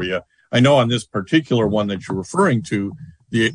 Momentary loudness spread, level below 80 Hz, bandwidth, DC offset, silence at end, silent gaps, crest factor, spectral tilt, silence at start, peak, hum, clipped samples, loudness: 11 LU; -52 dBFS; 10.5 kHz; under 0.1%; 0 s; none; 18 dB; -6 dB/octave; 0 s; -2 dBFS; none; under 0.1%; -19 LUFS